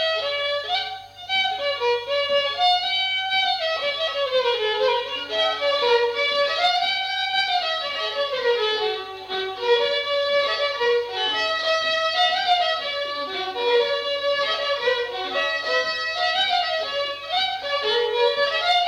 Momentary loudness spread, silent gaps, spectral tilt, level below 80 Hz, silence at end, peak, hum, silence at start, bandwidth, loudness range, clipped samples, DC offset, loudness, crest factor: 5 LU; none; -1 dB/octave; -64 dBFS; 0 s; -6 dBFS; none; 0 s; 15.5 kHz; 2 LU; under 0.1%; under 0.1%; -22 LUFS; 16 dB